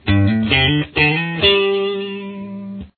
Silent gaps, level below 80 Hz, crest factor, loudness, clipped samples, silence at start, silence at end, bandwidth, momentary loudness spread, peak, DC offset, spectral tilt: none; -38 dBFS; 16 dB; -15 LUFS; under 0.1%; 0.05 s; 0.1 s; 4.6 kHz; 16 LU; -2 dBFS; under 0.1%; -8.5 dB/octave